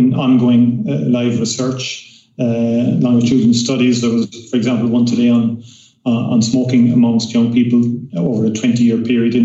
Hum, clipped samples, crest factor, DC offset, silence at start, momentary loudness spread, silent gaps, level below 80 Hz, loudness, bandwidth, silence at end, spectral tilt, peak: none; under 0.1%; 10 dB; under 0.1%; 0 s; 7 LU; none; -58 dBFS; -14 LUFS; 8 kHz; 0 s; -6 dB/octave; -4 dBFS